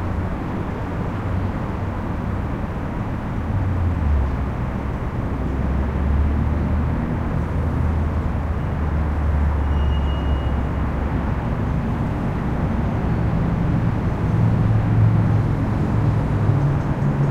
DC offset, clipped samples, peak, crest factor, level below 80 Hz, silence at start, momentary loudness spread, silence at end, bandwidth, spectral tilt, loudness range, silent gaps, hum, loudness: under 0.1%; under 0.1%; -6 dBFS; 14 dB; -24 dBFS; 0 s; 7 LU; 0 s; 7 kHz; -9 dB/octave; 5 LU; none; none; -22 LUFS